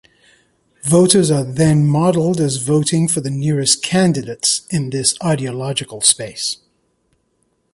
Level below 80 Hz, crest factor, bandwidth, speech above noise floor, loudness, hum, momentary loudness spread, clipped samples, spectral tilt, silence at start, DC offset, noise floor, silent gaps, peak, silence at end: -52 dBFS; 16 dB; 11.5 kHz; 49 dB; -16 LUFS; none; 9 LU; under 0.1%; -4.5 dB/octave; 0.85 s; under 0.1%; -65 dBFS; none; 0 dBFS; 1.2 s